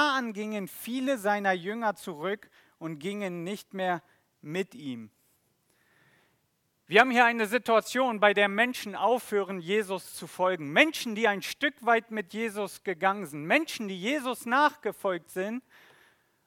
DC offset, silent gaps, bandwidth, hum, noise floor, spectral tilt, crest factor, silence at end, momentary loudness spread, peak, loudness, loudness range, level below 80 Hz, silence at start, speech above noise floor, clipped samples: under 0.1%; none; 18 kHz; none; -74 dBFS; -4 dB/octave; 24 dB; 0.85 s; 13 LU; -4 dBFS; -28 LUFS; 11 LU; -78 dBFS; 0 s; 46 dB; under 0.1%